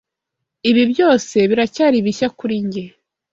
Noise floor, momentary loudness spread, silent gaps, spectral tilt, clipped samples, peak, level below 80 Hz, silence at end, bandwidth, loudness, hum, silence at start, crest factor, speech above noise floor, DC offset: -80 dBFS; 10 LU; none; -5 dB/octave; under 0.1%; -2 dBFS; -58 dBFS; 0.45 s; 7.8 kHz; -16 LUFS; none; 0.65 s; 16 dB; 64 dB; under 0.1%